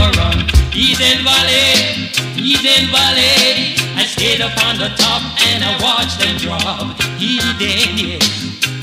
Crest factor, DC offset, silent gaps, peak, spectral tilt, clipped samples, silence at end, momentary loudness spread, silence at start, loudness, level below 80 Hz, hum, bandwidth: 14 dB; under 0.1%; none; 0 dBFS; -2.5 dB/octave; under 0.1%; 0 s; 8 LU; 0 s; -12 LUFS; -26 dBFS; none; 16 kHz